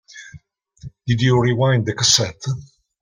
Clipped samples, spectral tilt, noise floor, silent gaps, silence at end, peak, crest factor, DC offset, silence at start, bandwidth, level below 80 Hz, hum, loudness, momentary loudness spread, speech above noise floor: under 0.1%; -4 dB/octave; -46 dBFS; none; 0.35 s; -2 dBFS; 18 dB; under 0.1%; 0.15 s; 16 kHz; -50 dBFS; none; -17 LUFS; 18 LU; 29 dB